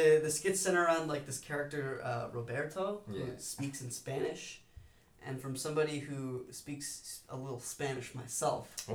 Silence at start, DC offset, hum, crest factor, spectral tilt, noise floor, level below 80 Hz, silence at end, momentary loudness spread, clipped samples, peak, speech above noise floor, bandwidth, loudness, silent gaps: 0 s; under 0.1%; none; 20 dB; -4 dB/octave; -58 dBFS; -68 dBFS; 0 s; 14 LU; under 0.1%; -16 dBFS; 22 dB; over 20 kHz; -37 LUFS; none